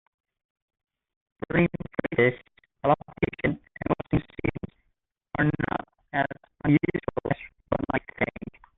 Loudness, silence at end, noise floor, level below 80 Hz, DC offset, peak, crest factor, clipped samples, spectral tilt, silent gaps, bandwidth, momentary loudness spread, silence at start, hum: -28 LUFS; 0.3 s; -75 dBFS; -50 dBFS; under 0.1%; -8 dBFS; 20 dB; under 0.1%; -10.5 dB/octave; none; 4 kHz; 10 LU; 1.5 s; none